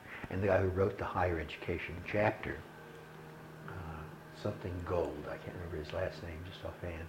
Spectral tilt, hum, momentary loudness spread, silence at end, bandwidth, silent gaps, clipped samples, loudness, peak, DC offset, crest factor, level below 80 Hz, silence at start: -7 dB/octave; none; 18 LU; 0 s; 16 kHz; none; under 0.1%; -37 LUFS; -16 dBFS; under 0.1%; 22 dB; -54 dBFS; 0 s